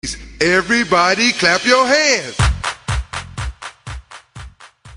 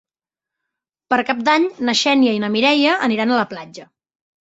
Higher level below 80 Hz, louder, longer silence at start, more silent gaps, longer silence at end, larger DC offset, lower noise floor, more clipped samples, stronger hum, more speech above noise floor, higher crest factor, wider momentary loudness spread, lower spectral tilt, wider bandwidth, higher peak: first, -30 dBFS vs -64 dBFS; about the same, -15 LUFS vs -17 LUFS; second, 0.05 s vs 1.1 s; neither; second, 0 s vs 0.55 s; neither; second, -40 dBFS vs -89 dBFS; neither; neither; second, 26 dB vs 72 dB; about the same, 16 dB vs 18 dB; first, 20 LU vs 8 LU; about the same, -3.5 dB/octave vs -3.5 dB/octave; first, 11 kHz vs 8 kHz; about the same, -2 dBFS vs -2 dBFS